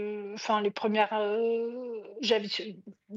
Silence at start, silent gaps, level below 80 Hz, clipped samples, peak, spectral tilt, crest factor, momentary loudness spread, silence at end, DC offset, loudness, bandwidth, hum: 0 s; none; -86 dBFS; under 0.1%; -14 dBFS; -2 dB/octave; 16 dB; 12 LU; 0 s; under 0.1%; -30 LUFS; 7.6 kHz; none